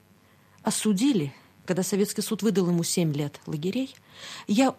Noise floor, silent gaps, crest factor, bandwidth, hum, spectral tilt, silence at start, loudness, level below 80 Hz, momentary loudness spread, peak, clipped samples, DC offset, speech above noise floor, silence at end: -58 dBFS; none; 18 dB; 15 kHz; none; -5 dB/octave; 0.65 s; -27 LUFS; -70 dBFS; 12 LU; -8 dBFS; under 0.1%; under 0.1%; 33 dB; 0.05 s